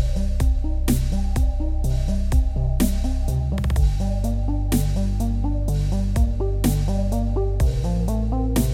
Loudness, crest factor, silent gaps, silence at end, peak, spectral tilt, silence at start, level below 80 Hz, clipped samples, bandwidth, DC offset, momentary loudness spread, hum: -23 LUFS; 12 dB; none; 0 s; -6 dBFS; -7 dB/octave; 0 s; -22 dBFS; under 0.1%; 16.5 kHz; under 0.1%; 3 LU; none